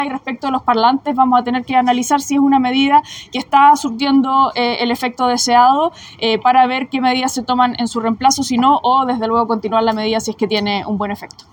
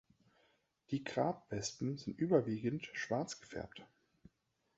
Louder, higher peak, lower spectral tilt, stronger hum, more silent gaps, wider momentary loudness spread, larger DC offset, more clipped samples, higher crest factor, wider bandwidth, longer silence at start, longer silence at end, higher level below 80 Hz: first, -15 LUFS vs -39 LUFS; first, 0 dBFS vs -18 dBFS; second, -3.5 dB/octave vs -5.5 dB/octave; neither; neither; second, 8 LU vs 14 LU; neither; neither; second, 14 dB vs 22 dB; first, 19 kHz vs 8 kHz; second, 0 s vs 0.9 s; second, 0.25 s vs 0.9 s; first, -52 dBFS vs -70 dBFS